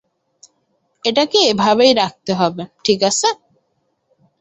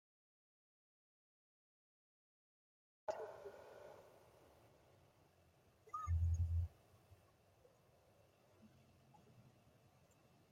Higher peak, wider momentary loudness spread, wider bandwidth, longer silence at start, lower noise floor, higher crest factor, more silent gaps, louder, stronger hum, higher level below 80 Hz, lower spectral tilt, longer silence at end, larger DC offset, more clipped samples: first, 0 dBFS vs -30 dBFS; second, 9 LU vs 25 LU; first, 8.4 kHz vs 7.4 kHz; second, 1.05 s vs 3.1 s; second, -67 dBFS vs -73 dBFS; about the same, 18 dB vs 20 dB; neither; first, -15 LUFS vs -45 LUFS; neither; about the same, -60 dBFS vs -60 dBFS; second, -3 dB/octave vs -7.5 dB/octave; about the same, 1.05 s vs 1.05 s; neither; neither